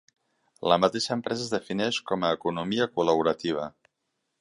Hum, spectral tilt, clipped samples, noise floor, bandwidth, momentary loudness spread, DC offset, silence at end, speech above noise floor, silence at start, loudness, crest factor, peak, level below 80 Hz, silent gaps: none; -4.5 dB/octave; under 0.1%; -80 dBFS; 11.5 kHz; 8 LU; under 0.1%; 0.7 s; 53 dB; 0.6 s; -27 LUFS; 22 dB; -6 dBFS; -64 dBFS; none